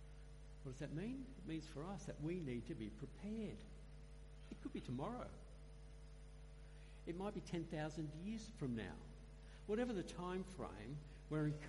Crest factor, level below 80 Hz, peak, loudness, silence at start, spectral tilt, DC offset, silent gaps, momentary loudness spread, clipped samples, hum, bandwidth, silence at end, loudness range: 18 dB; -58 dBFS; -30 dBFS; -49 LUFS; 0 s; -7 dB/octave; under 0.1%; none; 16 LU; under 0.1%; none; 11.5 kHz; 0 s; 5 LU